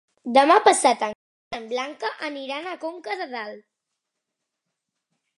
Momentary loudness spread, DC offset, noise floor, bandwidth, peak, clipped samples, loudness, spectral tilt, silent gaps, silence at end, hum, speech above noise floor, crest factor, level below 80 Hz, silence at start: 18 LU; under 0.1%; -82 dBFS; 11.5 kHz; -2 dBFS; under 0.1%; -22 LUFS; -1.5 dB/octave; 1.15-1.51 s; 1.8 s; none; 60 dB; 22 dB; -74 dBFS; 0.25 s